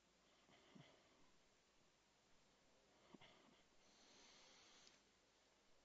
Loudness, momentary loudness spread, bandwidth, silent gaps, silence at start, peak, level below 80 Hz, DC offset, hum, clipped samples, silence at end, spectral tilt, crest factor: -68 LUFS; 2 LU; 7.6 kHz; none; 0 s; -50 dBFS; under -90 dBFS; under 0.1%; none; under 0.1%; 0 s; -2.5 dB/octave; 22 dB